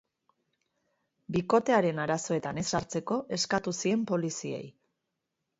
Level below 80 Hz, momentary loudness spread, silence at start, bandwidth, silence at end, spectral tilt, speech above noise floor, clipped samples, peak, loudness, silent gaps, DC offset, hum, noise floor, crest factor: -64 dBFS; 9 LU; 1.3 s; 8 kHz; 0.9 s; -4.5 dB/octave; 54 dB; under 0.1%; -10 dBFS; -30 LUFS; none; under 0.1%; none; -84 dBFS; 20 dB